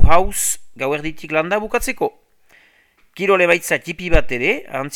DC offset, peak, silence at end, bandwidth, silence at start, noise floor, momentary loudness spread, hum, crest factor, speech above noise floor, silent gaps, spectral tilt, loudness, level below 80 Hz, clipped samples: under 0.1%; 0 dBFS; 0 s; 17 kHz; 0 s; -55 dBFS; 8 LU; none; 16 dB; 39 dB; none; -4 dB/octave; -19 LUFS; -26 dBFS; 0.3%